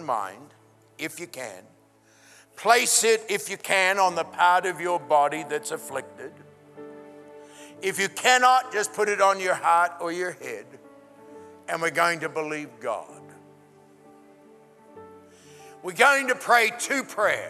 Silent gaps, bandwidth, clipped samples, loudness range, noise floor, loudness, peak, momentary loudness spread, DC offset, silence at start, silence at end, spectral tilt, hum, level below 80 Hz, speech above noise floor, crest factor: none; 14.5 kHz; under 0.1%; 8 LU; -58 dBFS; -23 LUFS; -2 dBFS; 18 LU; under 0.1%; 0 s; 0 s; -1.5 dB/octave; none; -84 dBFS; 34 dB; 22 dB